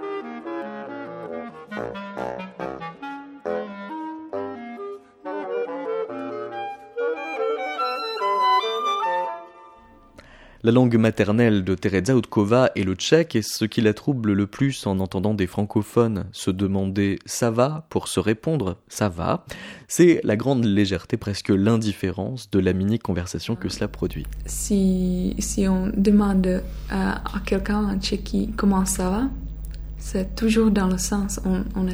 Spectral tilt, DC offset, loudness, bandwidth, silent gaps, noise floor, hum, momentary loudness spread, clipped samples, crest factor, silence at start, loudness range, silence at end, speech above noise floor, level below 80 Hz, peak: -5.5 dB/octave; under 0.1%; -23 LUFS; over 20 kHz; none; -49 dBFS; none; 14 LU; under 0.1%; 20 dB; 0 s; 11 LU; 0 s; 28 dB; -38 dBFS; -2 dBFS